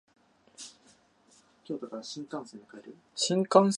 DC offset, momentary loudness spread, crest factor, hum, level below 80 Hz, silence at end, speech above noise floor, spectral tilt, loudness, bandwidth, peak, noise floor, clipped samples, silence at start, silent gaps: under 0.1%; 24 LU; 24 dB; none; -82 dBFS; 0 s; 34 dB; -4.5 dB/octave; -31 LUFS; 11.5 kHz; -6 dBFS; -64 dBFS; under 0.1%; 0.6 s; none